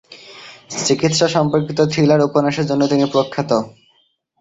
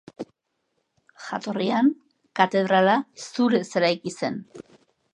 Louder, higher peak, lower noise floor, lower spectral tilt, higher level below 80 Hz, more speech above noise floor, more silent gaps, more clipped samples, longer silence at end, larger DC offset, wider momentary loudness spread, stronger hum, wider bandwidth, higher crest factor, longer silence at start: first, -16 LUFS vs -23 LUFS; about the same, -2 dBFS vs -2 dBFS; second, -61 dBFS vs -75 dBFS; about the same, -5 dB/octave vs -5.5 dB/octave; first, -54 dBFS vs -74 dBFS; second, 45 dB vs 53 dB; neither; neither; first, 0.7 s vs 0.55 s; neither; about the same, 20 LU vs 21 LU; neither; second, 8.2 kHz vs 10.5 kHz; second, 16 dB vs 22 dB; about the same, 0.1 s vs 0.2 s